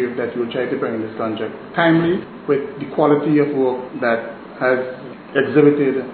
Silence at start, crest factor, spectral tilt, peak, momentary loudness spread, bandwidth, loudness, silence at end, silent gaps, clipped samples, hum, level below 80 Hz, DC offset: 0 s; 18 dB; -11 dB/octave; 0 dBFS; 10 LU; 4.5 kHz; -19 LUFS; 0 s; none; under 0.1%; none; -60 dBFS; under 0.1%